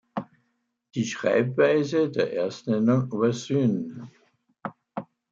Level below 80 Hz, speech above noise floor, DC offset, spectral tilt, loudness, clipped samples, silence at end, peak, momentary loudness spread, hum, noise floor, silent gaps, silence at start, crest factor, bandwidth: -72 dBFS; 50 dB; under 0.1%; -6.5 dB/octave; -24 LUFS; under 0.1%; 0.25 s; -8 dBFS; 17 LU; none; -74 dBFS; none; 0.15 s; 18 dB; 7.8 kHz